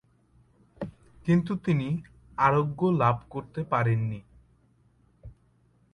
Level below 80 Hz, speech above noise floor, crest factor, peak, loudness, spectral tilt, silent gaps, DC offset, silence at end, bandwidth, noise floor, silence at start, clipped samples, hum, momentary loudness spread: -56 dBFS; 39 dB; 22 dB; -8 dBFS; -27 LUFS; -9 dB/octave; none; under 0.1%; 0.65 s; 9.4 kHz; -64 dBFS; 0.8 s; under 0.1%; none; 17 LU